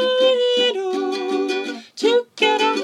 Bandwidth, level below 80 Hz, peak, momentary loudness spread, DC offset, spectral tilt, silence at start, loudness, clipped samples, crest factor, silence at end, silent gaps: 11.5 kHz; -88 dBFS; -4 dBFS; 7 LU; under 0.1%; -2 dB/octave; 0 s; -19 LUFS; under 0.1%; 16 dB; 0 s; none